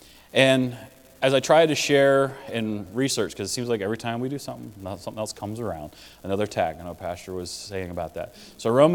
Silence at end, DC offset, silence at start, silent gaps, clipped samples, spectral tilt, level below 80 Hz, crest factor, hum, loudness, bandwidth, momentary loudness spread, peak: 0 s; under 0.1%; 0.35 s; none; under 0.1%; -4.5 dB/octave; -58 dBFS; 22 dB; none; -24 LUFS; 18 kHz; 18 LU; -2 dBFS